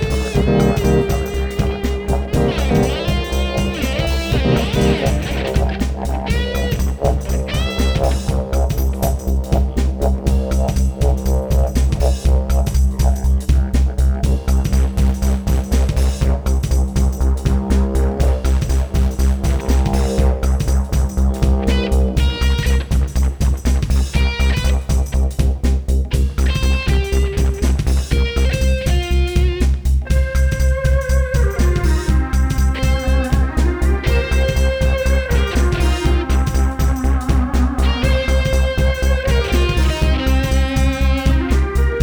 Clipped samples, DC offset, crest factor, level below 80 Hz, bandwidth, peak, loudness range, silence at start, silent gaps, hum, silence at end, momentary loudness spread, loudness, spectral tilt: under 0.1%; under 0.1%; 14 dB; -16 dBFS; 19 kHz; -2 dBFS; 2 LU; 0 s; none; none; 0 s; 3 LU; -18 LUFS; -6 dB/octave